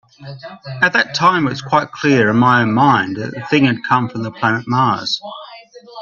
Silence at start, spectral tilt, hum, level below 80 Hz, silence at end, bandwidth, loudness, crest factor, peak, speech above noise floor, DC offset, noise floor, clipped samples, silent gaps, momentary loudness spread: 0.2 s; -5.5 dB/octave; none; -56 dBFS; 0 s; 7.4 kHz; -15 LUFS; 16 dB; 0 dBFS; 23 dB; under 0.1%; -39 dBFS; under 0.1%; none; 19 LU